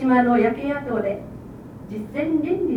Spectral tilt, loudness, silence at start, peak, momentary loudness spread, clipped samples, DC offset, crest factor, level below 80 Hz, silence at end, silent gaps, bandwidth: -8.5 dB/octave; -22 LUFS; 0 s; -6 dBFS; 21 LU; under 0.1%; under 0.1%; 16 dB; -50 dBFS; 0 s; none; 5.2 kHz